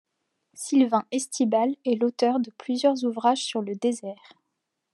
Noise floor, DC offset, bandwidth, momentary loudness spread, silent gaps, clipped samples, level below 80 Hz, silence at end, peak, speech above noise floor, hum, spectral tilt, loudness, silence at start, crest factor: -80 dBFS; under 0.1%; 12 kHz; 7 LU; none; under 0.1%; -88 dBFS; 0.8 s; -8 dBFS; 56 dB; none; -4 dB/octave; -25 LUFS; 0.55 s; 18 dB